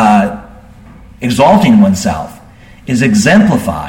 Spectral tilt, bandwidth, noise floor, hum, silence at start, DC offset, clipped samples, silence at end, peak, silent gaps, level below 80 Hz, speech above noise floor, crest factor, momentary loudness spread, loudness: -6 dB/octave; 16.5 kHz; -37 dBFS; none; 0 s; under 0.1%; under 0.1%; 0 s; 0 dBFS; none; -36 dBFS; 28 dB; 10 dB; 17 LU; -10 LUFS